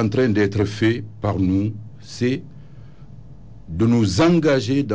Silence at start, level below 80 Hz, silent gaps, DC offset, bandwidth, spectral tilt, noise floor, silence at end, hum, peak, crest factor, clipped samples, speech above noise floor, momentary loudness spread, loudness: 0 s; -42 dBFS; none; 0.8%; 8 kHz; -7 dB/octave; -42 dBFS; 0 s; none; -8 dBFS; 12 dB; under 0.1%; 23 dB; 12 LU; -20 LUFS